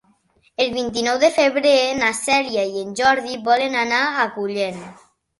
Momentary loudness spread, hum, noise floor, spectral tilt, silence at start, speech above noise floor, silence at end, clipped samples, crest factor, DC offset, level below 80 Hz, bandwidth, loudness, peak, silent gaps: 8 LU; none; -60 dBFS; -2.5 dB/octave; 0.6 s; 41 dB; 0.45 s; under 0.1%; 16 dB; under 0.1%; -58 dBFS; 12 kHz; -19 LUFS; -4 dBFS; none